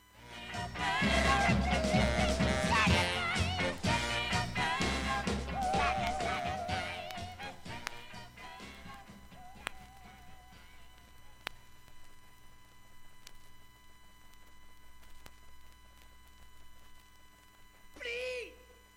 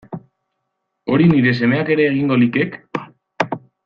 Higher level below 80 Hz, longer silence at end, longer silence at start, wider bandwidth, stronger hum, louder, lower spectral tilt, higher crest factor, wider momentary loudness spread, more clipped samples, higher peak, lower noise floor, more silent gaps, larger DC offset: first, -46 dBFS vs -54 dBFS; about the same, 0.2 s vs 0.3 s; about the same, 0.15 s vs 0.1 s; first, 16.5 kHz vs 6.8 kHz; neither; second, -33 LUFS vs -16 LUFS; second, -4.5 dB/octave vs -8.5 dB/octave; first, 24 dB vs 16 dB; first, 21 LU vs 16 LU; neither; second, -14 dBFS vs -2 dBFS; second, -58 dBFS vs -74 dBFS; neither; neither